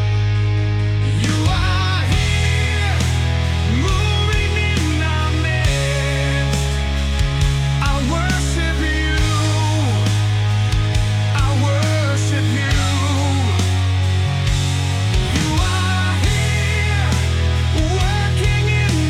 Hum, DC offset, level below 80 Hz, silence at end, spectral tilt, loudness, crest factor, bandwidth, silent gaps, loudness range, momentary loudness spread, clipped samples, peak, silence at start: none; under 0.1%; -24 dBFS; 0 s; -5 dB/octave; -18 LUFS; 12 dB; 14 kHz; none; 1 LU; 2 LU; under 0.1%; -4 dBFS; 0 s